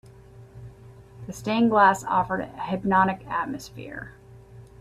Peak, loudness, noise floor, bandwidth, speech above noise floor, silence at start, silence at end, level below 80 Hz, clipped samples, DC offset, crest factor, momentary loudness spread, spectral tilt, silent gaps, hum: -6 dBFS; -23 LUFS; -48 dBFS; 14 kHz; 24 dB; 0.35 s; 0.15 s; -54 dBFS; under 0.1%; under 0.1%; 20 dB; 24 LU; -5.5 dB/octave; none; none